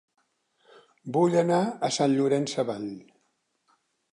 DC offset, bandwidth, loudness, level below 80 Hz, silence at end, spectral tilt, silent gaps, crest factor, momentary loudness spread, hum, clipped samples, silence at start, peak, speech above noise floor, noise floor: under 0.1%; 11 kHz; -25 LUFS; -78 dBFS; 1.1 s; -5.5 dB/octave; none; 16 dB; 15 LU; none; under 0.1%; 1.05 s; -12 dBFS; 49 dB; -74 dBFS